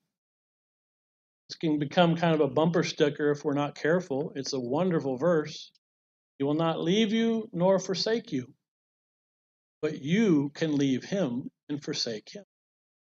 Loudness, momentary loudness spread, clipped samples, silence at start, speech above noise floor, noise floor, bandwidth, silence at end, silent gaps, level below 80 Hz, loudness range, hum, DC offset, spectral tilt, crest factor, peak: -28 LUFS; 12 LU; under 0.1%; 1.5 s; over 63 dB; under -90 dBFS; 7.8 kHz; 0.7 s; 5.78-6.39 s, 8.68-9.81 s, 11.63-11.67 s; -76 dBFS; 3 LU; none; under 0.1%; -6 dB/octave; 20 dB; -8 dBFS